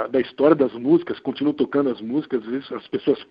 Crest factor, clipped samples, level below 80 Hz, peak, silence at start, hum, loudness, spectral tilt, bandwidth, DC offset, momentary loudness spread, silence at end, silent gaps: 18 dB; under 0.1%; -62 dBFS; -2 dBFS; 0 s; none; -22 LUFS; -9.5 dB/octave; 5.2 kHz; under 0.1%; 11 LU; 0.1 s; none